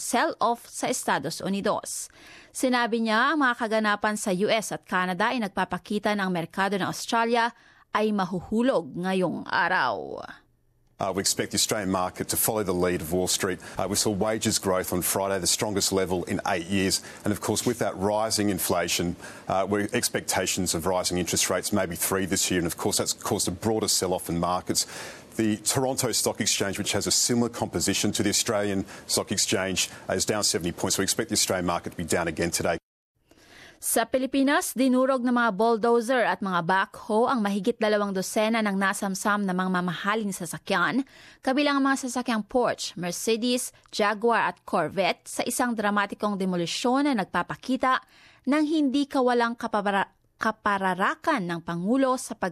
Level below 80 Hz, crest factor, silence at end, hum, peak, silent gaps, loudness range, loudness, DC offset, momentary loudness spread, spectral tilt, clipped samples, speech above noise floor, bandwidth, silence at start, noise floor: -54 dBFS; 16 dB; 0 s; none; -10 dBFS; 32.83-33.15 s; 2 LU; -25 LUFS; under 0.1%; 6 LU; -3.5 dB/octave; under 0.1%; 39 dB; 14.5 kHz; 0 s; -64 dBFS